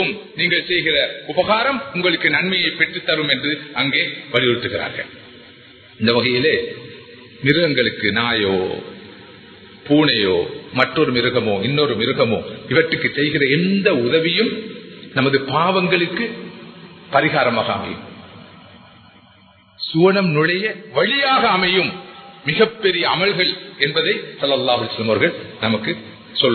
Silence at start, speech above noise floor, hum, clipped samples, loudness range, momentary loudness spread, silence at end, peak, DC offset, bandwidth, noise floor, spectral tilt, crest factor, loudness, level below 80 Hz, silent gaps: 0 s; 32 dB; none; under 0.1%; 4 LU; 11 LU; 0 s; 0 dBFS; under 0.1%; 4.6 kHz; -50 dBFS; -8 dB/octave; 18 dB; -17 LUFS; -54 dBFS; none